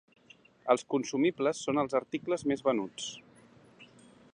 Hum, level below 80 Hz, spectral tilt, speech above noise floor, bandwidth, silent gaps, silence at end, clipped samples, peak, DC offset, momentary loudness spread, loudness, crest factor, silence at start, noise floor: none; -72 dBFS; -4.5 dB/octave; 30 dB; 10.5 kHz; none; 0.5 s; under 0.1%; -10 dBFS; under 0.1%; 11 LU; -31 LUFS; 22 dB; 0.65 s; -60 dBFS